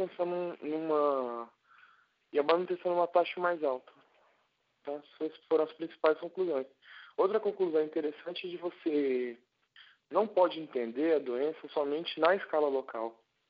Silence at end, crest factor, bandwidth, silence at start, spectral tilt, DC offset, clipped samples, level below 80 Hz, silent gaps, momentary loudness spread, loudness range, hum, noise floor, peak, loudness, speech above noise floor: 0.4 s; 22 dB; 5.2 kHz; 0 s; -3 dB/octave; under 0.1%; under 0.1%; under -90 dBFS; none; 12 LU; 3 LU; none; -75 dBFS; -10 dBFS; -32 LUFS; 44 dB